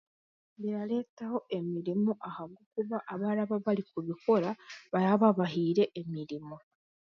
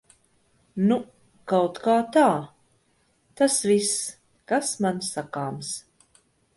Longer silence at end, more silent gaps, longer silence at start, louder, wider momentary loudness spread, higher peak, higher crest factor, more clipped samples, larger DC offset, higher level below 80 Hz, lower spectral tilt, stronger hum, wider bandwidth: second, 0.45 s vs 0.75 s; first, 1.09-1.17 s, 2.66-2.71 s vs none; second, 0.6 s vs 0.75 s; second, -32 LUFS vs -24 LUFS; about the same, 14 LU vs 15 LU; second, -12 dBFS vs -8 dBFS; about the same, 20 dB vs 18 dB; neither; neither; second, -76 dBFS vs -68 dBFS; first, -8.5 dB/octave vs -4 dB/octave; neither; second, 6.8 kHz vs 12 kHz